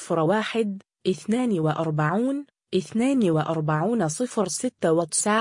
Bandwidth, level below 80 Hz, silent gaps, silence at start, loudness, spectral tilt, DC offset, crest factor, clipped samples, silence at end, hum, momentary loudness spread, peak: 11 kHz; -66 dBFS; none; 0 s; -24 LUFS; -5 dB/octave; under 0.1%; 14 dB; under 0.1%; 0 s; none; 7 LU; -10 dBFS